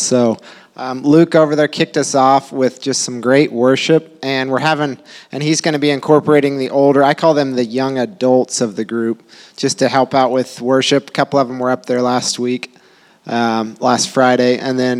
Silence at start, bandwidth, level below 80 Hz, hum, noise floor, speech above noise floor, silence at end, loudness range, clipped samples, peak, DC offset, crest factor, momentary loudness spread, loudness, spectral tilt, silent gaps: 0 s; 13.5 kHz; -68 dBFS; none; -48 dBFS; 34 dB; 0 s; 3 LU; under 0.1%; 0 dBFS; under 0.1%; 14 dB; 8 LU; -15 LUFS; -4.5 dB/octave; none